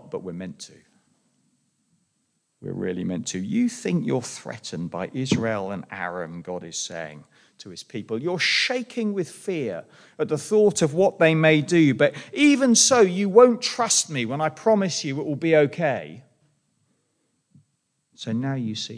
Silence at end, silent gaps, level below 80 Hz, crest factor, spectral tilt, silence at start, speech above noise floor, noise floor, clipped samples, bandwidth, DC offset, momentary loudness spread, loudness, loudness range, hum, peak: 0 s; none; -70 dBFS; 20 dB; -4 dB/octave; 0.05 s; 50 dB; -73 dBFS; under 0.1%; 10.5 kHz; under 0.1%; 19 LU; -22 LUFS; 12 LU; none; -2 dBFS